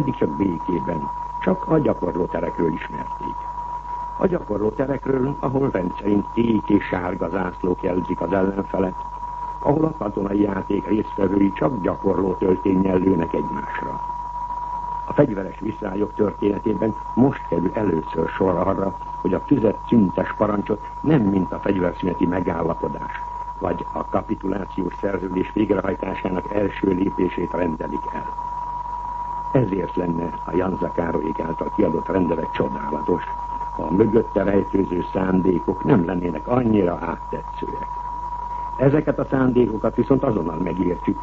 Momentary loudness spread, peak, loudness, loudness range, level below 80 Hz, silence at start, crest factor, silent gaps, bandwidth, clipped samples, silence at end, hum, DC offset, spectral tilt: 9 LU; -4 dBFS; -22 LUFS; 4 LU; -40 dBFS; 0 s; 18 dB; none; 7.4 kHz; under 0.1%; 0 s; none; under 0.1%; -9.5 dB/octave